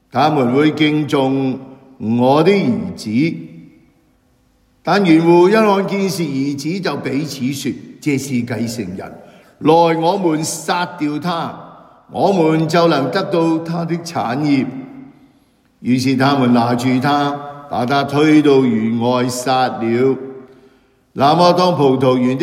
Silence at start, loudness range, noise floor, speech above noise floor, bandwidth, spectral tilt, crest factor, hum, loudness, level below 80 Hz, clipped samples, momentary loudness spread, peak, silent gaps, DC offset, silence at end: 0.15 s; 4 LU; -56 dBFS; 42 dB; 16 kHz; -6 dB/octave; 16 dB; none; -15 LUFS; -60 dBFS; under 0.1%; 13 LU; 0 dBFS; none; under 0.1%; 0 s